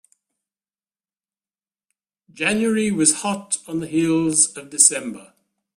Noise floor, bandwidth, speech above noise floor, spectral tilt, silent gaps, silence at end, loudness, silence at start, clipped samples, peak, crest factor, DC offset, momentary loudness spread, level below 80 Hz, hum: under -90 dBFS; 15.5 kHz; over 70 dB; -3 dB/octave; none; 0.55 s; -18 LUFS; 2.35 s; under 0.1%; 0 dBFS; 22 dB; under 0.1%; 10 LU; -62 dBFS; none